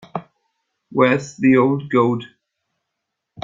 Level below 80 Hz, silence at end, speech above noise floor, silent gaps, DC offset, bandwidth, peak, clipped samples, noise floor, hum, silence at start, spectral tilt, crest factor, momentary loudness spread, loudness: -62 dBFS; 1.2 s; 63 dB; none; under 0.1%; 7.6 kHz; -2 dBFS; under 0.1%; -79 dBFS; none; 0.15 s; -7 dB/octave; 18 dB; 14 LU; -18 LUFS